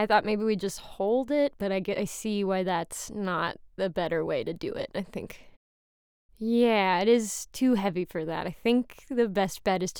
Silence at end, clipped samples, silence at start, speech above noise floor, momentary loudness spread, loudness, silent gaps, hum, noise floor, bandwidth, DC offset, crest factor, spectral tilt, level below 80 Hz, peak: 0 s; under 0.1%; 0 s; over 63 dB; 11 LU; -28 LUFS; 5.56-6.29 s; none; under -90 dBFS; over 20 kHz; under 0.1%; 18 dB; -5 dB/octave; -58 dBFS; -10 dBFS